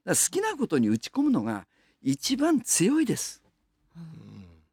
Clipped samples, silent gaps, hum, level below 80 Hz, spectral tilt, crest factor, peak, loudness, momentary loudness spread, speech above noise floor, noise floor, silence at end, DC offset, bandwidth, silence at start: under 0.1%; none; none; -66 dBFS; -3.5 dB/octave; 16 dB; -12 dBFS; -26 LUFS; 18 LU; 43 dB; -69 dBFS; 0.25 s; under 0.1%; 18.5 kHz; 0.05 s